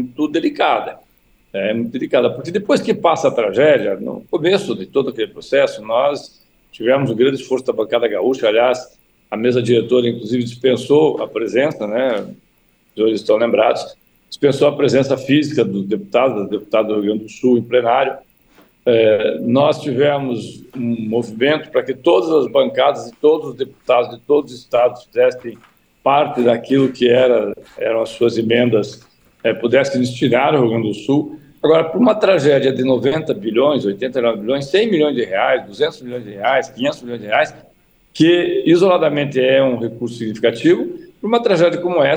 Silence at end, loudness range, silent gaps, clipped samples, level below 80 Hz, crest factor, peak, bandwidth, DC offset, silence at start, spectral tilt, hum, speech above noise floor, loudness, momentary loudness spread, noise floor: 0 s; 3 LU; none; under 0.1%; -58 dBFS; 14 dB; -2 dBFS; over 20 kHz; under 0.1%; 0 s; -6 dB/octave; none; 42 dB; -16 LUFS; 9 LU; -57 dBFS